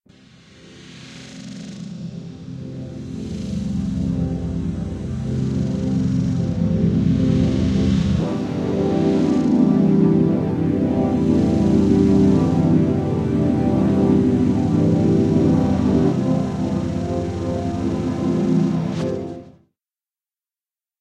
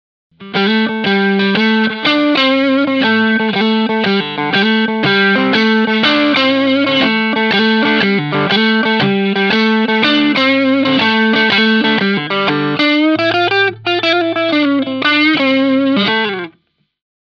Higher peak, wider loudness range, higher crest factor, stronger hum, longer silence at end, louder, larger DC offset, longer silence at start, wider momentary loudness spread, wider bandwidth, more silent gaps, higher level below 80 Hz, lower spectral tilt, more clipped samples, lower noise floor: second, -4 dBFS vs 0 dBFS; first, 9 LU vs 1 LU; about the same, 16 dB vs 12 dB; neither; first, 1.5 s vs 0.75 s; second, -19 LUFS vs -12 LUFS; neither; first, 0.65 s vs 0.4 s; first, 16 LU vs 3 LU; first, 9 kHz vs 6.8 kHz; neither; first, -36 dBFS vs -60 dBFS; first, -8.5 dB/octave vs -6 dB/octave; neither; first, under -90 dBFS vs -58 dBFS